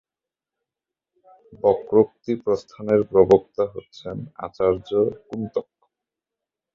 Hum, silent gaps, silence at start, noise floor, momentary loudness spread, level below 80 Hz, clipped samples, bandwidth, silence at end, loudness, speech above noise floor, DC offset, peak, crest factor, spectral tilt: none; none; 1.5 s; -89 dBFS; 16 LU; -54 dBFS; under 0.1%; 7.2 kHz; 1.15 s; -21 LUFS; 68 dB; under 0.1%; -2 dBFS; 22 dB; -8.5 dB/octave